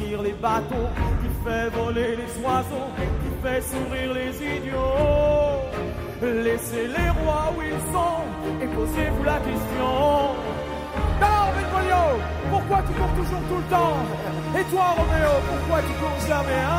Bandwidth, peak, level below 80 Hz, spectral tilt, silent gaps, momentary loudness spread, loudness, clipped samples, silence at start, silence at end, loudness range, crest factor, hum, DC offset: 16 kHz; -6 dBFS; -32 dBFS; -6 dB/octave; none; 7 LU; -24 LUFS; under 0.1%; 0 s; 0 s; 3 LU; 16 dB; none; under 0.1%